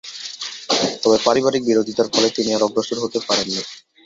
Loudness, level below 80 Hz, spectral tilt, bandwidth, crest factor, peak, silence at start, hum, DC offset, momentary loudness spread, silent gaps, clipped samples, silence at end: -19 LUFS; -60 dBFS; -3 dB/octave; 7.8 kHz; 18 dB; -2 dBFS; 0.05 s; none; under 0.1%; 12 LU; none; under 0.1%; 0.25 s